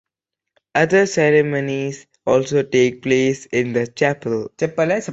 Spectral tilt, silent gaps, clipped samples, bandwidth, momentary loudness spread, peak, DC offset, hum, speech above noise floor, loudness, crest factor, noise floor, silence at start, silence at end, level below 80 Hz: -5.5 dB/octave; none; under 0.1%; 8 kHz; 8 LU; -2 dBFS; under 0.1%; none; 65 dB; -18 LUFS; 16 dB; -83 dBFS; 0.75 s; 0 s; -58 dBFS